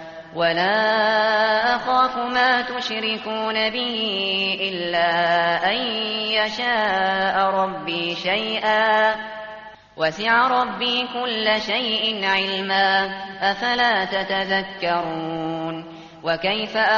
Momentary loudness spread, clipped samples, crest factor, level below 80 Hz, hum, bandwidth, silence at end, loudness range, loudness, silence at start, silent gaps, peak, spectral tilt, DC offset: 8 LU; under 0.1%; 16 dB; -58 dBFS; none; 7.2 kHz; 0 s; 2 LU; -20 LUFS; 0 s; none; -6 dBFS; 0 dB/octave; under 0.1%